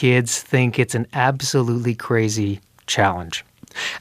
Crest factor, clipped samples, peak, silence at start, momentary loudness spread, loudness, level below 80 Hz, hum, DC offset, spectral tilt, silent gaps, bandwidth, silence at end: 20 dB; under 0.1%; -2 dBFS; 0 s; 10 LU; -20 LUFS; -56 dBFS; none; under 0.1%; -4.5 dB/octave; none; 15.5 kHz; 0 s